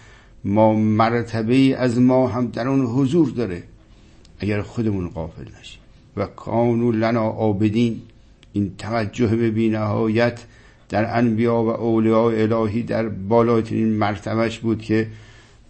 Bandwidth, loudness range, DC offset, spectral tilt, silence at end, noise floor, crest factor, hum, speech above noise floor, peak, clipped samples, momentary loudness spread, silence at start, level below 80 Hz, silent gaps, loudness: 8.6 kHz; 5 LU; under 0.1%; -8 dB/octave; 0.45 s; -48 dBFS; 16 dB; none; 28 dB; -4 dBFS; under 0.1%; 12 LU; 0.45 s; -48 dBFS; none; -20 LUFS